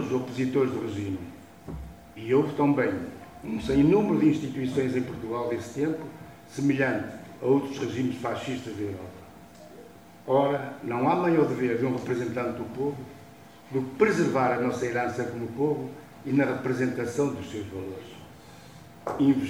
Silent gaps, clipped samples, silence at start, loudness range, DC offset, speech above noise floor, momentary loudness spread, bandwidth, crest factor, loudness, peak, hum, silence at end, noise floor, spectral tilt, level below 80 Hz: none; under 0.1%; 0 s; 5 LU; under 0.1%; 23 dB; 21 LU; 15.5 kHz; 20 dB; -27 LUFS; -8 dBFS; none; 0 s; -49 dBFS; -7 dB/octave; -56 dBFS